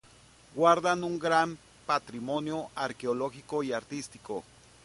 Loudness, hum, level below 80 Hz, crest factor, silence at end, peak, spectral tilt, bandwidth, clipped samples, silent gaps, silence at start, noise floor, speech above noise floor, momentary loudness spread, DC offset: -30 LUFS; none; -66 dBFS; 22 dB; 0.45 s; -8 dBFS; -4.5 dB/octave; 11.5 kHz; under 0.1%; none; 0.55 s; -57 dBFS; 28 dB; 15 LU; under 0.1%